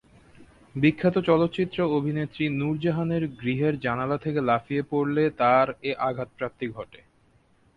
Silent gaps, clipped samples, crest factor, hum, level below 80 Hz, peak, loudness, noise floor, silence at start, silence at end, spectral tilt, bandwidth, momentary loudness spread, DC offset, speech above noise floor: none; under 0.1%; 18 dB; none; -58 dBFS; -8 dBFS; -25 LUFS; -62 dBFS; 0.4 s; 0.9 s; -9 dB/octave; 5.2 kHz; 11 LU; under 0.1%; 37 dB